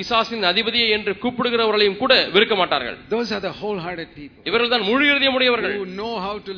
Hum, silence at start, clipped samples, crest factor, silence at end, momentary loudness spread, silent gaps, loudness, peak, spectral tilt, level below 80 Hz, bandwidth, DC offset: none; 0 s; under 0.1%; 20 dB; 0 s; 12 LU; none; -19 LUFS; 0 dBFS; -4.5 dB/octave; -54 dBFS; 5.4 kHz; under 0.1%